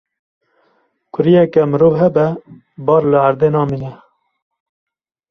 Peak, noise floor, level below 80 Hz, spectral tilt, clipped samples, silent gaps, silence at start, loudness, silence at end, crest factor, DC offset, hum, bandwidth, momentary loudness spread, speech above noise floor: -2 dBFS; -61 dBFS; -52 dBFS; -10 dB/octave; under 0.1%; none; 1.15 s; -14 LUFS; 1.35 s; 14 dB; under 0.1%; none; 5.8 kHz; 14 LU; 48 dB